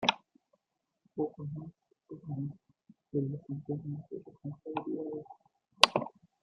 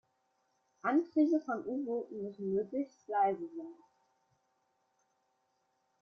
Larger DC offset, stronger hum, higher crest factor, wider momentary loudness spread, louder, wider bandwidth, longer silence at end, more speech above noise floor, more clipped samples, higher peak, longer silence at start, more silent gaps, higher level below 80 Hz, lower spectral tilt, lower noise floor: neither; neither; first, 36 dB vs 18 dB; first, 22 LU vs 12 LU; about the same, -34 LUFS vs -34 LUFS; first, 13.5 kHz vs 6.6 kHz; second, 0.35 s vs 2.3 s; about the same, 45 dB vs 45 dB; neither; first, 0 dBFS vs -18 dBFS; second, 0 s vs 0.85 s; neither; first, -72 dBFS vs -82 dBFS; second, -4 dB/octave vs -8 dB/octave; first, -84 dBFS vs -79 dBFS